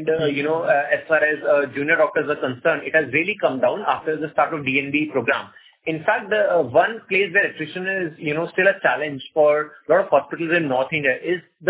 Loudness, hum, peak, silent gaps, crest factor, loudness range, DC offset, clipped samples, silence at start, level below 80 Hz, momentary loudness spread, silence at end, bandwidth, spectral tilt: -20 LUFS; none; -2 dBFS; none; 18 dB; 2 LU; under 0.1%; under 0.1%; 0 s; -64 dBFS; 7 LU; 0 s; 4 kHz; -9 dB/octave